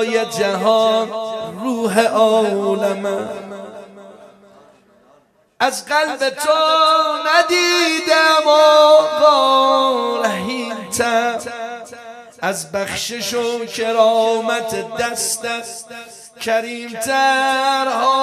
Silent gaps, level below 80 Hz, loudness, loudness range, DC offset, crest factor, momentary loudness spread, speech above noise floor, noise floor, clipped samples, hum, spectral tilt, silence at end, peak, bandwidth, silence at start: none; -64 dBFS; -16 LUFS; 9 LU; under 0.1%; 16 dB; 16 LU; 38 dB; -54 dBFS; under 0.1%; none; -2.5 dB/octave; 0 s; 0 dBFS; 14 kHz; 0 s